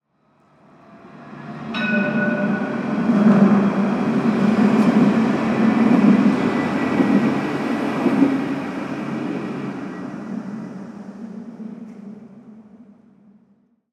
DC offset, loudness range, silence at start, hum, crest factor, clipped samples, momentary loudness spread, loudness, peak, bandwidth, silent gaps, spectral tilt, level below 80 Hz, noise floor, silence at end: under 0.1%; 17 LU; 0.9 s; none; 18 dB; under 0.1%; 20 LU; -19 LUFS; -2 dBFS; 9.4 kHz; none; -7.5 dB/octave; -60 dBFS; -60 dBFS; 1.15 s